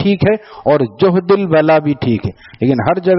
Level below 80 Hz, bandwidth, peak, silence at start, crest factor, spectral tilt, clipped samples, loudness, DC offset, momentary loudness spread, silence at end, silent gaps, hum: -46 dBFS; 5.8 kHz; 0 dBFS; 0 s; 12 dB; -6.5 dB/octave; under 0.1%; -14 LUFS; under 0.1%; 7 LU; 0 s; none; none